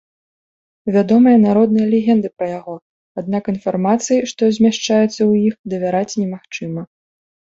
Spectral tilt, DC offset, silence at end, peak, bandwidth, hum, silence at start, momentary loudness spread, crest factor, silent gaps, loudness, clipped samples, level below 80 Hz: -6 dB/octave; under 0.1%; 0.6 s; -2 dBFS; 7.8 kHz; none; 0.85 s; 16 LU; 14 dB; 2.82-3.15 s, 5.59-5.64 s; -16 LUFS; under 0.1%; -58 dBFS